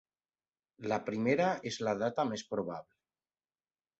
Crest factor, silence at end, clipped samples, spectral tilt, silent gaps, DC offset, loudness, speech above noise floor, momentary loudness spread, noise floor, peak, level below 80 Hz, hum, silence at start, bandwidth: 20 dB; 1.15 s; under 0.1%; -4.5 dB/octave; none; under 0.1%; -34 LUFS; over 56 dB; 11 LU; under -90 dBFS; -16 dBFS; -72 dBFS; none; 0.8 s; 8 kHz